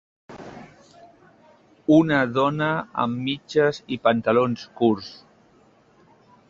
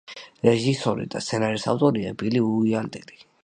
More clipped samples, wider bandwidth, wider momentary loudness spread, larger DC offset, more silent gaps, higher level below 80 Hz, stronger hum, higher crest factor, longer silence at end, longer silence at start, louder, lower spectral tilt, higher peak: neither; second, 7.4 kHz vs 9.8 kHz; first, 22 LU vs 8 LU; neither; neither; about the same, -62 dBFS vs -60 dBFS; neither; about the same, 20 dB vs 20 dB; first, 1.35 s vs 0.45 s; first, 0.3 s vs 0.1 s; about the same, -22 LUFS vs -23 LUFS; about the same, -7 dB/octave vs -6 dB/octave; about the same, -4 dBFS vs -4 dBFS